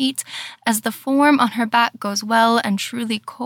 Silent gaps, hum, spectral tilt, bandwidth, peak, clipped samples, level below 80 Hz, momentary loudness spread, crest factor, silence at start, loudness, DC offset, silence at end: none; none; -3.5 dB/octave; 18 kHz; -4 dBFS; under 0.1%; -78 dBFS; 9 LU; 16 dB; 0 s; -19 LUFS; under 0.1%; 0 s